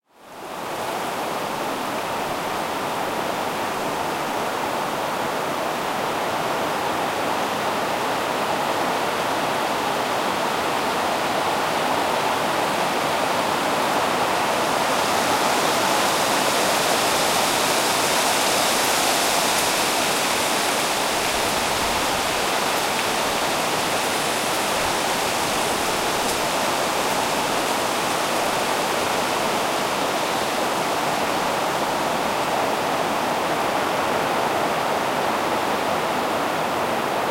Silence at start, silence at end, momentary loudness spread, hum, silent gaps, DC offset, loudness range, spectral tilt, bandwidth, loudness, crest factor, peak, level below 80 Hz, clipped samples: 0.2 s; 0 s; 6 LU; none; none; under 0.1%; 6 LU; -2 dB/octave; 16 kHz; -21 LUFS; 16 dB; -8 dBFS; -52 dBFS; under 0.1%